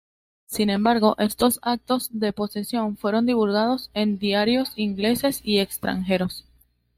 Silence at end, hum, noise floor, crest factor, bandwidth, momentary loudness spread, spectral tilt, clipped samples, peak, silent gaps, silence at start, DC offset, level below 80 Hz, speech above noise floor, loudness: 0.55 s; none; -61 dBFS; 18 dB; 16 kHz; 6 LU; -4.5 dB/octave; under 0.1%; -6 dBFS; none; 0.5 s; under 0.1%; -54 dBFS; 39 dB; -23 LUFS